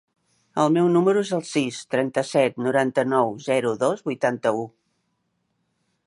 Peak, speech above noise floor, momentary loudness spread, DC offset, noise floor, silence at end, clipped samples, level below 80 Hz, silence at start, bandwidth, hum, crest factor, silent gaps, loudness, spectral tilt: -6 dBFS; 51 dB; 7 LU; under 0.1%; -73 dBFS; 1.4 s; under 0.1%; -72 dBFS; 0.55 s; 11.5 kHz; none; 18 dB; none; -22 LUFS; -5.5 dB/octave